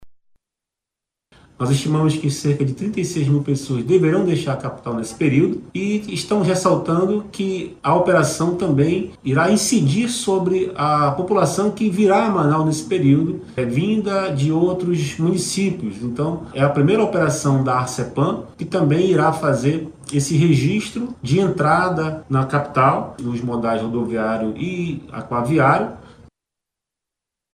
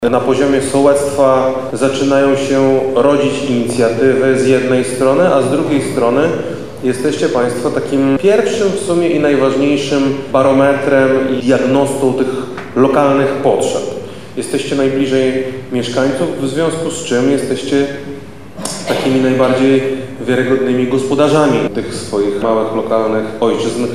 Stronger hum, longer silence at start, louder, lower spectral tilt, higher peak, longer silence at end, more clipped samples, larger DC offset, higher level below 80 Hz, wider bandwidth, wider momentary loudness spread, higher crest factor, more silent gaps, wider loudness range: neither; about the same, 0 s vs 0 s; second, -19 LUFS vs -13 LUFS; about the same, -6 dB/octave vs -5.5 dB/octave; about the same, -2 dBFS vs 0 dBFS; first, 1.5 s vs 0 s; neither; second, under 0.1% vs 2%; about the same, -52 dBFS vs -48 dBFS; first, 15.5 kHz vs 13.5 kHz; about the same, 8 LU vs 8 LU; about the same, 16 dB vs 14 dB; neither; about the same, 3 LU vs 4 LU